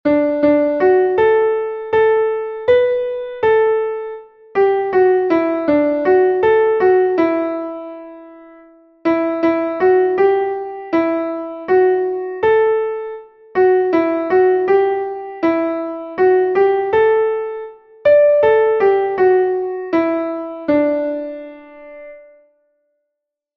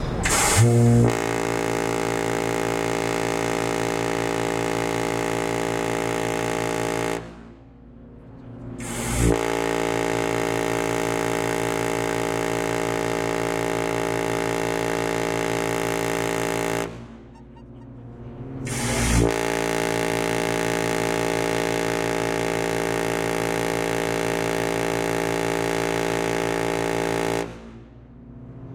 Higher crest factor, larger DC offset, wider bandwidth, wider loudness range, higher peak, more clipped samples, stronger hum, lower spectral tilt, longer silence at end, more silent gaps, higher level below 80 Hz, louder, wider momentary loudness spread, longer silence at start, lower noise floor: about the same, 14 dB vs 18 dB; neither; second, 5.6 kHz vs 17 kHz; about the same, 4 LU vs 4 LU; first, -2 dBFS vs -6 dBFS; neither; second, none vs 60 Hz at -50 dBFS; first, -8 dB/octave vs -4.5 dB/octave; first, 1.35 s vs 0 s; neither; second, -56 dBFS vs -40 dBFS; first, -16 LUFS vs -23 LUFS; about the same, 12 LU vs 11 LU; about the same, 0.05 s vs 0 s; first, -79 dBFS vs -45 dBFS